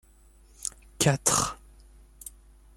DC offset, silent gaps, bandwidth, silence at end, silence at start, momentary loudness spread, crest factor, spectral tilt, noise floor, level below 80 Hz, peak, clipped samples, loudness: under 0.1%; none; 16.5 kHz; 0.45 s; 0.6 s; 22 LU; 24 dB; -3 dB/octave; -56 dBFS; -52 dBFS; -8 dBFS; under 0.1%; -26 LUFS